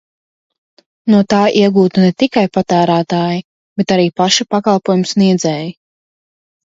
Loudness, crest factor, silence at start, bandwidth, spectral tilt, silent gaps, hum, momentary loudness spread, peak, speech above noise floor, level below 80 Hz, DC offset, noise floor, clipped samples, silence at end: -13 LUFS; 14 dB; 1.05 s; 7.8 kHz; -5.5 dB/octave; 3.44-3.76 s; none; 10 LU; 0 dBFS; over 78 dB; -56 dBFS; under 0.1%; under -90 dBFS; under 0.1%; 0.95 s